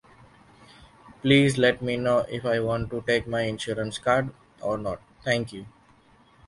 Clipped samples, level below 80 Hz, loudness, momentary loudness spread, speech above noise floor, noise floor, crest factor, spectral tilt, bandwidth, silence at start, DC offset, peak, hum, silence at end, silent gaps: under 0.1%; -52 dBFS; -25 LUFS; 14 LU; 33 dB; -57 dBFS; 22 dB; -5.5 dB/octave; 11.5 kHz; 0.8 s; under 0.1%; -4 dBFS; none; 0.8 s; none